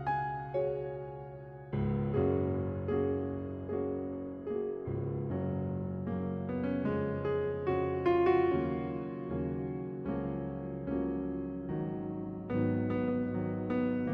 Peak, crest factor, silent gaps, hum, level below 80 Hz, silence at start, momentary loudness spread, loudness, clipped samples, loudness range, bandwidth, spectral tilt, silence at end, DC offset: -18 dBFS; 16 dB; none; none; -56 dBFS; 0 s; 8 LU; -34 LUFS; under 0.1%; 5 LU; 5.4 kHz; -11 dB/octave; 0 s; under 0.1%